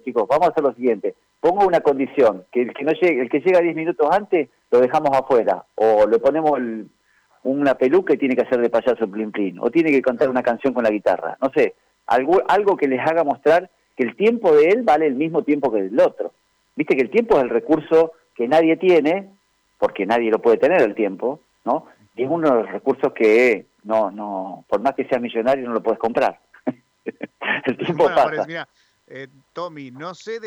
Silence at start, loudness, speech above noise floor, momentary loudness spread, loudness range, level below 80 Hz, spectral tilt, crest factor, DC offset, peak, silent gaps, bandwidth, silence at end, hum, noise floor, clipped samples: 0.05 s; -19 LUFS; 40 dB; 14 LU; 4 LU; -60 dBFS; -6.5 dB/octave; 12 dB; under 0.1%; -6 dBFS; none; 9.8 kHz; 0 s; none; -58 dBFS; under 0.1%